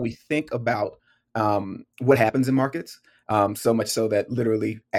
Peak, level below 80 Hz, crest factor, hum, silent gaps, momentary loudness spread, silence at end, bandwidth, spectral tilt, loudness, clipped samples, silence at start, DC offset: -4 dBFS; -62 dBFS; 20 dB; none; none; 13 LU; 0 s; 17 kHz; -6 dB/octave; -23 LUFS; under 0.1%; 0 s; under 0.1%